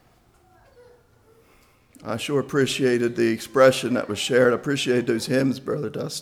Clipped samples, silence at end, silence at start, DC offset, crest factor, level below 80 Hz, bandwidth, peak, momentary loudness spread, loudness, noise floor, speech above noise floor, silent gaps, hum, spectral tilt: under 0.1%; 0 s; 2.05 s; under 0.1%; 18 dB; -62 dBFS; 16 kHz; -6 dBFS; 11 LU; -22 LUFS; -58 dBFS; 36 dB; none; none; -5 dB/octave